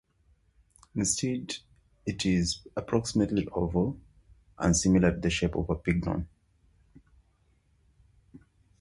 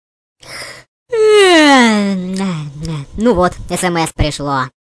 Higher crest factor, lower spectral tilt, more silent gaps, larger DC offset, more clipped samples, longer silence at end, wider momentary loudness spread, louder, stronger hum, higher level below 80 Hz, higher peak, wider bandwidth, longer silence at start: first, 20 dB vs 12 dB; about the same, -5 dB/octave vs -4.5 dB/octave; second, none vs 0.88-1.06 s; neither; neither; first, 0.45 s vs 0.25 s; second, 14 LU vs 20 LU; second, -29 LUFS vs -12 LUFS; neither; second, -46 dBFS vs -32 dBFS; second, -10 dBFS vs -2 dBFS; about the same, 11.5 kHz vs 11 kHz; first, 0.95 s vs 0.45 s